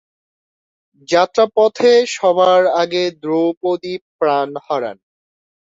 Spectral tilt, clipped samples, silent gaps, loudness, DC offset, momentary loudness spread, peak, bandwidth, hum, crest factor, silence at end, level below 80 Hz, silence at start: -4 dB/octave; under 0.1%; 3.57-3.61 s, 4.01-4.19 s; -15 LUFS; under 0.1%; 10 LU; -2 dBFS; 7.8 kHz; none; 14 dB; 0.85 s; -64 dBFS; 1.1 s